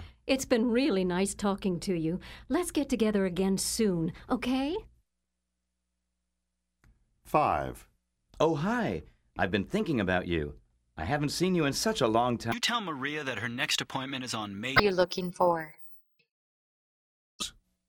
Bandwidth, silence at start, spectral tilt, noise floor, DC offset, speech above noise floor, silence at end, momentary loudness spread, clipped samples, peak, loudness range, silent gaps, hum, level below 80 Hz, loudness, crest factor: 18 kHz; 0 s; -4.5 dB/octave; -84 dBFS; under 0.1%; 55 dB; 0.4 s; 11 LU; under 0.1%; -8 dBFS; 6 LU; 16.31-17.39 s; 60 Hz at -60 dBFS; -54 dBFS; -30 LUFS; 24 dB